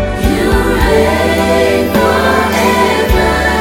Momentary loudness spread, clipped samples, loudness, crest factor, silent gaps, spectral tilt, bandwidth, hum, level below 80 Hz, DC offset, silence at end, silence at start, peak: 1 LU; under 0.1%; -11 LUFS; 10 dB; none; -5 dB/octave; 17.5 kHz; none; -20 dBFS; under 0.1%; 0 s; 0 s; 0 dBFS